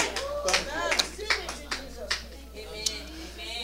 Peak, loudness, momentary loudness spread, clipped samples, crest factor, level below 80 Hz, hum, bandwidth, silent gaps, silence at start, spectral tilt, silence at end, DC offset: -6 dBFS; -29 LUFS; 14 LU; under 0.1%; 26 dB; -46 dBFS; none; 16 kHz; none; 0 s; -1 dB/octave; 0 s; under 0.1%